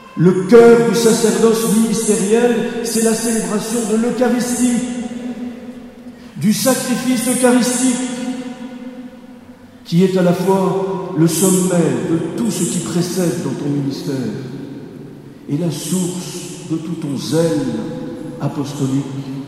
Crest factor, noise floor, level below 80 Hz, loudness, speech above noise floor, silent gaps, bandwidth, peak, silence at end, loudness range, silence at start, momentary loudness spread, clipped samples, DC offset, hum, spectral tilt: 16 dB; -39 dBFS; -54 dBFS; -16 LUFS; 24 dB; none; 16 kHz; 0 dBFS; 0 s; 7 LU; 0 s; 17 LU; under 0.1%; under 0.1%; none; -5 dB/octave